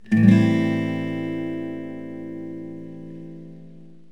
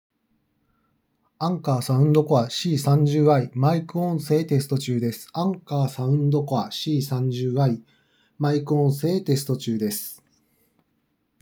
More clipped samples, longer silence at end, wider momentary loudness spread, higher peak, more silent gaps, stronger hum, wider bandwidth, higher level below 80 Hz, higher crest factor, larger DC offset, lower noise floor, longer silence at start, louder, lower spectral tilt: neither; second, 0.25 s vs 1.25 s; first, 23 LU vs 8 LU; first, -2 dBFS vs -6 dBFS; neither; neither; second, 9.2 kHz vs over 20 kHz; first, -68 dBFS vs -76 dBFS; about the same, 22 dB vs 18 dB; first, 0.6% vs under 0.1%; second, -46 dBFS vs -71 dBFS; second, 0.05 s vs 1.4 s; about the same, -22 LUFS vs -23 LUFS; first, -8.5 dB/octave vs -7 dB/octave